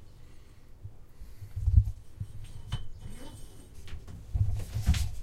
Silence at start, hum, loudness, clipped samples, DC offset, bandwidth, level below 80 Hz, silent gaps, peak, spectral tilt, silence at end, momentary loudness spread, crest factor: 0 s; none; -33 LUFS; under 0.1%; under 0.1%; 15 kHz; -36 dBFS; none; -10 dBFS; -6 dB/octave; 0 s; 23 LU; 22 dB